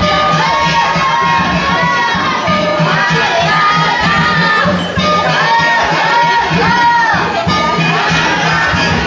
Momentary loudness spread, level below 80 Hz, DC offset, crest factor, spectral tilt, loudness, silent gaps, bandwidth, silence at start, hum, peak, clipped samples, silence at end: 3 LU; -34 dBFS; under 0.1%; 10 dB; -4.5 dB/octave; -11 LUFS; none; 7.8 kHz; 0 s; none; -2 dBFS; under 0.1%; 0 s